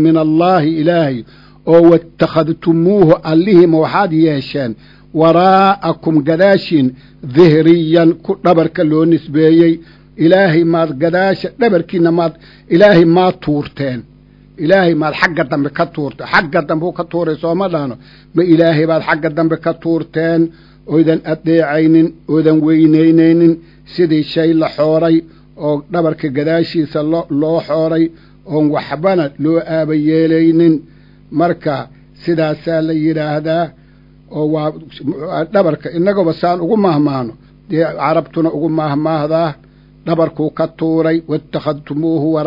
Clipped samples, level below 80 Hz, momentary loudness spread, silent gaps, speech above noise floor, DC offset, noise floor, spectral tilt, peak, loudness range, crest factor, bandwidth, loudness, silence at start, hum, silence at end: 0.3%; -48 dBFS; 11 LU; none; 31 dB; under 0.1%; -43 dBFS; -9 dB/octave; 0 dBFS; 5 LU; 12 dB; 6 kHz; -13 LUFS; 0 s; none; 0 s